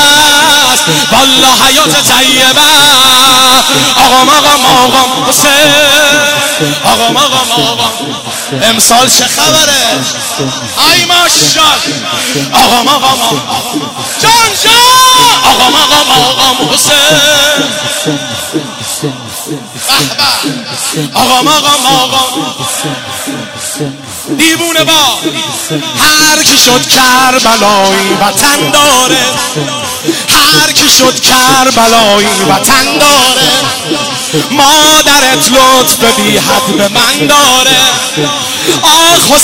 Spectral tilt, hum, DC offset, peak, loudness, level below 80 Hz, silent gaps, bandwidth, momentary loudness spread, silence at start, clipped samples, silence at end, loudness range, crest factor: -1.5 dB/octave; none; 1%; 0 dBFS; -5 LUFS; -38 dBFS; none; over 20 kHz; 11 LU; 0 s; 3%; 0 s; 6 LU; 6 dB